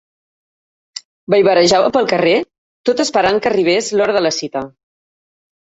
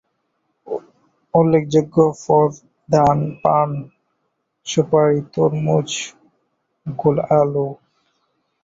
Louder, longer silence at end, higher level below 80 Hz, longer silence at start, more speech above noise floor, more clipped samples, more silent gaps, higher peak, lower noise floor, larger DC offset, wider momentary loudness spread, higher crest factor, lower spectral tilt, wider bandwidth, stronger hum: first, -14 LUFS vs -18 LUFS; about the same, 0.9 s vs 0.9 s; about the same, -54 dBFS vs -54 dBFS; first, 0.95 s vs 0.65 s; first, over 76 dB vs 55 dB; neither; first, 1.05-1.27 s, 2.58-2.84 s vs none; about the same, 0 dBFS vs -2 dBFS; first, under -90 dBFS vs -72 dBFS; neither; first, 21 LU vs 15 LU; about the same, 16 dB vs 18 dB; second, -4 dB/octave vs -6.5 dB/octave; about the same, 8.2 kHz vs 8 kHz; neither